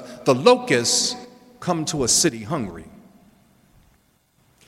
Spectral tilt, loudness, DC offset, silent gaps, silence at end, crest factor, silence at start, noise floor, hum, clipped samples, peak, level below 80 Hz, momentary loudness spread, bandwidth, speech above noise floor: -3 dB/octave; -19 LUFS; under 0.1%; none; 1.8 s; 22 dB; 0 s; -62 dBFS; none; under 0.1%; 0 dBFS; -54 dBFS; 16 LU; 16 kHz; 42 dB